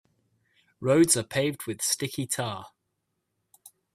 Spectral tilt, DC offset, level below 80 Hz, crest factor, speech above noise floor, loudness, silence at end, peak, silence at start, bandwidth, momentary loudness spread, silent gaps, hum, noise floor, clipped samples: -4 dB/octave; under 0.1%; -66 dBFS; 22 dB; 53 dB; -26 LUFS; 0.25 s; -8 dBFS; 0.8 s; 16 kHz; 12 LU; none; none; -79 dBFS; under 0.1%